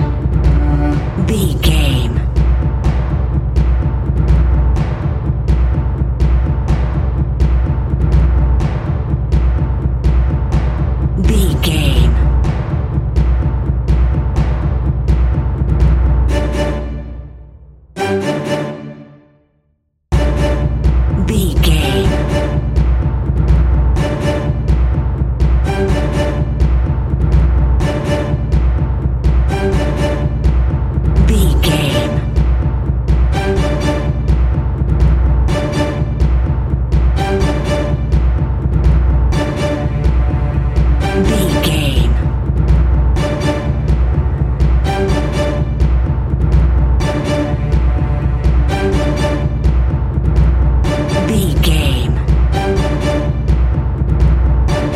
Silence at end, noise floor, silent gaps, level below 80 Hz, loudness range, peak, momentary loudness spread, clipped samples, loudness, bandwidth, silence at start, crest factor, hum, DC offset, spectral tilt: 0 s; -62 dBFS; none; -14 dBFS; 1 LU; 0 dBFS; 4 LU; under 0.1%; -15 LUFS; 13 kHz; 0 s; 12 dB; none; under 0.1%; -7 dB/octave